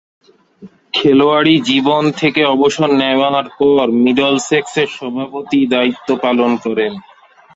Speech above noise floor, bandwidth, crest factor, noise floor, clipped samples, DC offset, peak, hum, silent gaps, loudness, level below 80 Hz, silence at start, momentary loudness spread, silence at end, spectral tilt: 27 dB; 8 kHz; 14 dB; -40 dBFS; under 0.1%; under 0.1%; 0 dBFS; none; none; -13 LUFS; -56 dBFS; 0.6 s; 8 LU; 0.55 s; -5 dB/octave